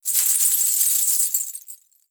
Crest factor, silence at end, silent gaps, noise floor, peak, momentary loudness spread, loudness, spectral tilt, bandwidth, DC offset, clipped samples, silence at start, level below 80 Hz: 18 dB; 0.35 s; none; -45 dBFS; -4 dBFS; 11 LU; -17 LUFS; 9 dB/octave; over 20 kHz; under 0.1%; under 0.1%; 0.05 s; under -90 dBFS